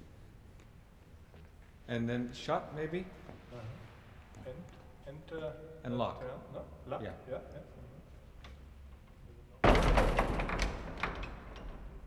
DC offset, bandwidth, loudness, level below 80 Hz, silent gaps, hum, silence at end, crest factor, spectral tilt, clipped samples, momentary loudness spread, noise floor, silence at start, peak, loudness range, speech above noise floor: under 0.1%; 13 kHz; -36 LUFS; -42 dBFS; none; none; 0 s; 26 dB; -6 dB/octave; under 0.1%; 26 LU; -57 dBFS; 0 s; -12 dBFS; 11 LU; 17 dB